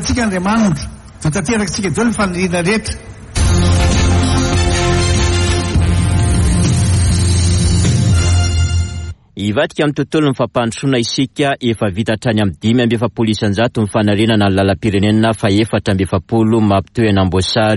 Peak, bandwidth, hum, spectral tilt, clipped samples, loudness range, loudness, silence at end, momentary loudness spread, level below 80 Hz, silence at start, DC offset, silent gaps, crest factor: -2 dBFS; 11.5 kHz; none; -5.5 dB/octave; under 0.1%; 3 LU; -14 LUFS; 0 s; 5 LU; -24 dBFS; 0 s; under 0.1%; none; 10 dB